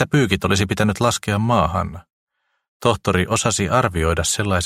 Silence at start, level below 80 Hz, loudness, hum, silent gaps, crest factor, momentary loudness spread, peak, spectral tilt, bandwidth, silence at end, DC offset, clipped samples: 0 s; -38 dBFS; -19 LUFS; none; 2.13-2.27 s, 2.68-2.80 s; 18 dB; 4 LU; 0 dBFS; -4.5 dB/octave; 16 kHz; 0 s; under 0.1%; under 0.1%